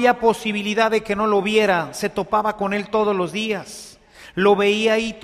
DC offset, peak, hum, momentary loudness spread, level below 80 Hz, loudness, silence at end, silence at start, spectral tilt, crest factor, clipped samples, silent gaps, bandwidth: under 0.1%; -4 dBFS; none; 8 LU; -54 dBFS; -20 LUFS; 0.05 s; 0 s; -4.5 dB/octave; 16 dB; under 0.1%; none; 14.5 kHz